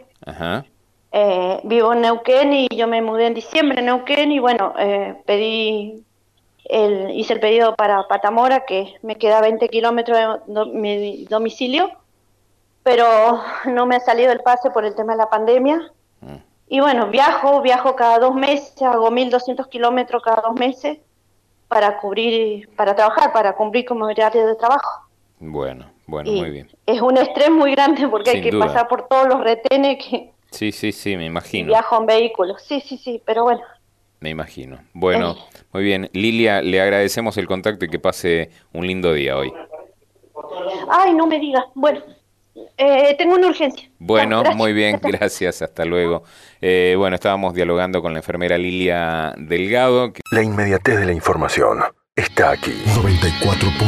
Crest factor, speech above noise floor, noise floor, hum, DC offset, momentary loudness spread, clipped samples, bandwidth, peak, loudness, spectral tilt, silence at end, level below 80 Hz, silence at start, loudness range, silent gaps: 16 dB; 44 dB; -61 dBFS; none; under 0.1%; 12 LU; under 0.1%; 13.5 kHz; -2 dBFS; -17 LUFS; -5.5 dB/octave; 0 s; -44 dBFS; 0.25 s; 4 LU; none